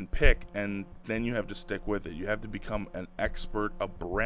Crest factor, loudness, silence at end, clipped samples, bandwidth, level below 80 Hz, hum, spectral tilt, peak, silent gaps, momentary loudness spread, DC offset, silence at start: 22 dB; -33 LUFS; 0 s; under 0.1%; 4 kHz; -36 dBFS; none; -4.5 dB/octave; -6 dBFS; none; 10 LU; under 0.1%; 0 s